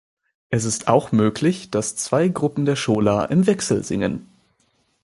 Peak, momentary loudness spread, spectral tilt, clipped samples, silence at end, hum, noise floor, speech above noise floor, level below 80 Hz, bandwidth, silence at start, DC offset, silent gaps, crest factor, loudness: -2 dBFS; 6 LU; -5.5 dB/octave; under 0.1%; 0.8 s; none; -65 dBFS; 46 dB; -52 dBFS; 11.5 kHz; 0.5 s; under 0.1%; none; 20 dB; -20 LUFS